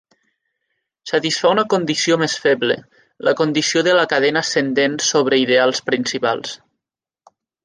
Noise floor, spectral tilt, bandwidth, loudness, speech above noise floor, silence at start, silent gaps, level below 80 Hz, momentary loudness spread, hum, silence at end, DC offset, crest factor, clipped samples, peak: -85 dBFS; -3 dB/octave; 10 kHz; -17 LUFS; 68 dB; 1.05 s; none; -68 dBFS; 7 LU; none; 1.1 s; under 0.1%; 16 dB; under 0.1%; -2 dBFS